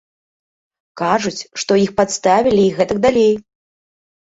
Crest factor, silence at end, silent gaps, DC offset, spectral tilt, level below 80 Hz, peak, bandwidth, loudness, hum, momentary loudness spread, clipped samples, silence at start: 16 dB; 0.8 s; none; under 0.1%; -4.5 dB/octave; -50 dBFS; -2 dBFS; 8 kHz; -16 LUFS; none; 10 LU; under 0.1%; 0.95 s